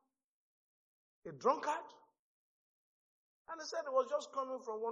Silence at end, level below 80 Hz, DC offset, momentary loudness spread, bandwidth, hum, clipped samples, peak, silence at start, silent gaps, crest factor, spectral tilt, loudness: 0 s; under -90 dBFS; under 0.1%; 17 LU; 7.6 kHz; none; under 0.1%; -18 dBFS; 1.25 s; 2.19-3.45 s; 24 dB; -2 dB/octave; -39 LUFS